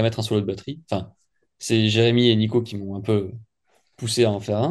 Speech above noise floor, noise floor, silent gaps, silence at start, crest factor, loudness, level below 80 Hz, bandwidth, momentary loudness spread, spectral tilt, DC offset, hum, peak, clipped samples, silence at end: 45 dB; -67 dBFS; none; 0 s; 20 dB; -22 LUFS; -58 dBFS; 12.5 kHz; 15 LU; -5.5 dB/octave; under 0.1%; none; -4 dBFS; under 0.1%; 0 s